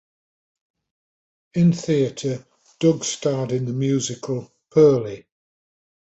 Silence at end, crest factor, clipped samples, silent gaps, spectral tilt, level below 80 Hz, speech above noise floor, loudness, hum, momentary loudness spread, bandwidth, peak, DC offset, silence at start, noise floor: 0.95 s; 18 dB; under 0.1%; none; -6 dB/octave; -60 dBFS; over 70 dB; -21 LUFS; none; 13 LU; 8.2 kHz; -4 dBFS; under 0.1%; 1.55 s; under -90 dBFS